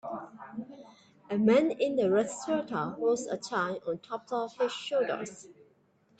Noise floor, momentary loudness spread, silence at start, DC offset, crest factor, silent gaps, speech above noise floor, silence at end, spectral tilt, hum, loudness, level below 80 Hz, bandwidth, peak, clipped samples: -67 dBFS; 18 LU; 0.05 s; under 0.1%; 18 dB; none; 37 dB; 0.65 s; -5 dB/octave; none; -30 LUFS; -74 dBFS; 9.2 kHz; -14 dBFS; under 0.1%